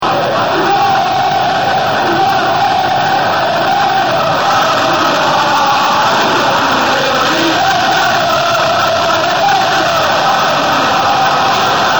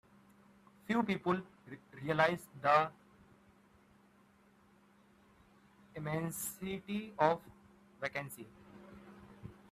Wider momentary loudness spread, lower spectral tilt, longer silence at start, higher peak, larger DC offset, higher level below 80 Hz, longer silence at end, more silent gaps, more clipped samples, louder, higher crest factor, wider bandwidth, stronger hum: second, 2 LU vs 24 LU; second, -3 dB/octave vs -5 dB/octave; second, 0 s vs 0.9 s; first, 0 dBFS vs -14 dBFS; first, 0.8% vs under 0.1%; first, -48 dBFS vs -72 dBFS; second, 0 s vs 0.2 s; neither; neither; first, -11 LUFS vs -36 LUFS; second, 12 dB vs 26 dB; first, over 20 kHz vs 15 kHz; neither